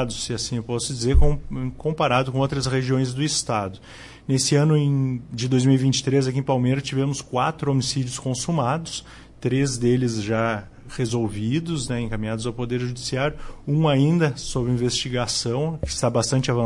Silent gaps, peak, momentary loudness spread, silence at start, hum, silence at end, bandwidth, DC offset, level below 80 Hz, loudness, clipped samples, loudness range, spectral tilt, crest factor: none; -6 dBFS; 9 LU; 0 s; none; 0 s; 11.5 kHz; under 0.1%; -34 dBFS; -23 LUFS; under 0.1%; 3 LU; -5.5 dB/octave; 16 dB